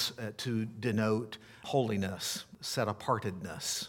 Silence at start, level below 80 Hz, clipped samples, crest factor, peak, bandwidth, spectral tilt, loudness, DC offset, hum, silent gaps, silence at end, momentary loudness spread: 0 s; -70 dBFS; under 0.1%; 18 dB; -16 dBFS; 18.5 kHz; -4.5 dB/octave; -34 LUFS; under 0.1%; none; none; 0 s; 7 LU